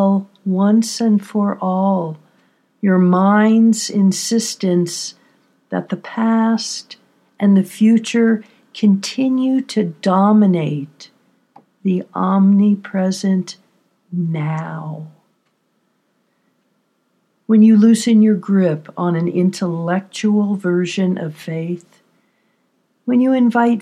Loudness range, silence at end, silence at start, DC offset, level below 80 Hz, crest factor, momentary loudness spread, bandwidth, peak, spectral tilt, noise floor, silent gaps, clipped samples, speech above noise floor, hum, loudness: 6 LU; 0 s; 0 s; under 0.1%; -78 dBFS; 14 dB; 13 LU; 12.5 kHz; -2 dBFS; -6 dB/octave; -65 dBFS; none; under 0.1%; 50 dB; none; -16 LUFS